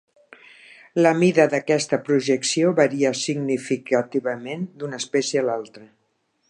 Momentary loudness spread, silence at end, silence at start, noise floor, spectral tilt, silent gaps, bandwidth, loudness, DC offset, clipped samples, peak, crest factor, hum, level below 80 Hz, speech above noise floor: 13 LU; 0.65 s; 0.95 s; -70 dBFS; -4.5 dB/octave; none; 11.5 kHz; -21 LUFS; under 0.1%; under 0.1%; -4 dBFS; 18 dB; none; -74 dBFS; 48 dB